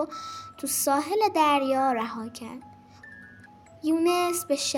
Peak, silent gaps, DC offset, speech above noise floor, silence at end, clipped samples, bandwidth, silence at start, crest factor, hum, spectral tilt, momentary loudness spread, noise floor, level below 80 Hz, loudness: -10 dBFS; none; under 0.1%; 25 dB; 0 s; under 0.1%; 17 kHz; 0 s; 16 dB; none; -2.5 dB/octave; 20 LU; -51 dBFS; -70 dBFS; -25 LUFS